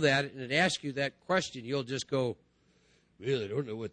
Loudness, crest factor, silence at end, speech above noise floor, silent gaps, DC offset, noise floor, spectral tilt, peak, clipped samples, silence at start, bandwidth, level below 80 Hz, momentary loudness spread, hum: -32 LUFS; 20 dB; 0.05 s; 36 dB; none; under 0.1%; -68 dBFS; -4.5 dB/octave; -12 dBFS; under 0.1%; 0 s; 10 kHz; -68 dBFS; 8 LU; none